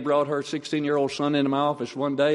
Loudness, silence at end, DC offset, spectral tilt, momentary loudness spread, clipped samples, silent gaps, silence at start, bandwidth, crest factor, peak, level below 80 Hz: -25 LUFS; 0 s; under 0.1%; -5.5 dB/octave; 5 LU; under 0.1%; none; 0 s; 11.5 kHz; 14 dB; -10 dBFS; -68 dBFS